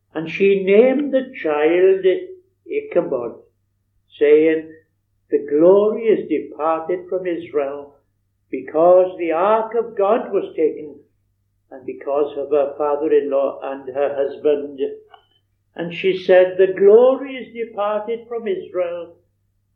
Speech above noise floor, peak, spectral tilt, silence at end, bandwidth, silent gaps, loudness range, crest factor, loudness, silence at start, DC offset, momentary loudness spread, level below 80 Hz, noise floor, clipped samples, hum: 49 dB; 0 dBFS; -8.5 dB/octave; 0.7 s; 4.7 kHz; none; 5 LU; 18 dB; -18 LUFS; 0.15 s; under 0.1%; 15 LU; -70 dBFS; -66 dBFS; under 0.1%; none